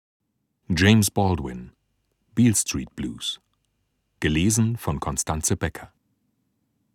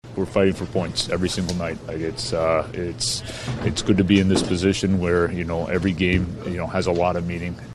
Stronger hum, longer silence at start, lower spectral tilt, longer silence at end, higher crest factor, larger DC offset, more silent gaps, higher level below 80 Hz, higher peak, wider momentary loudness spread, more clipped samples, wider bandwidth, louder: neither; first, 0.7 s vs 0.05 s; about the same, -4.5 dB/octave vs -5.5 dB/octave; first, 1.1 s vs 0 s; about the same, 20 dB vs 18 dB; neither; neither; about the same, -42 dBFS vs -42 dBFS; about the same, -4 dBFS vs -4 dBFS; first, 14 LU vs 9 LU; neither; first, 17 kHz vs 13 kHz; about the same, -23 LUFS vs -22 LUFS